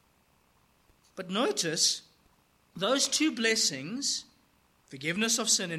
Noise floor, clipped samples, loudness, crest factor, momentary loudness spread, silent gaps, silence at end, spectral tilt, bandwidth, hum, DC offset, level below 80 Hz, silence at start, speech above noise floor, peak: -67 dBFS; under 0.1%; -28 LUFS; 20 dB; 10 LU; none; 0 s; -1.5 dB/octave; 16 kHz; none; under 0.1%; -74 dBFS; 1.15 s; 38 dB; -12 dBFS